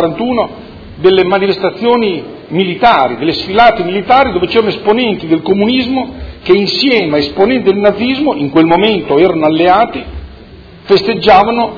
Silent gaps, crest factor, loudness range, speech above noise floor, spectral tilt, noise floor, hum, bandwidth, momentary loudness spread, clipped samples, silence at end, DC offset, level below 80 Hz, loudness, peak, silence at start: none; 10 dB; 1 LU; 24 dB; -7 dB/octave; -34 dBFS; none; 5.4 kHz; 8 LU; 0.8%; 0 s; under 0.1%; -36 dBFS; -10 LUFS; 0 dBFS; 0 s